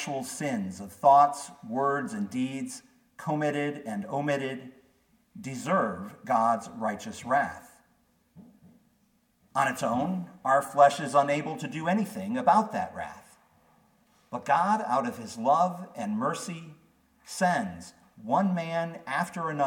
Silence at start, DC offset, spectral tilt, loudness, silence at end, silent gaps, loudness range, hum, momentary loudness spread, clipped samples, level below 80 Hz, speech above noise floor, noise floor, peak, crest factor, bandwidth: 0 s; under 0.1%; -5.5 dB/octave; -28 LUFS; 0 s; none; 6 LU; none; 16 LU; under 0.1%; -70 dBFS; 41 dB; -68 dBFS; -8 dBFS; 22 dB; 17.5 kHz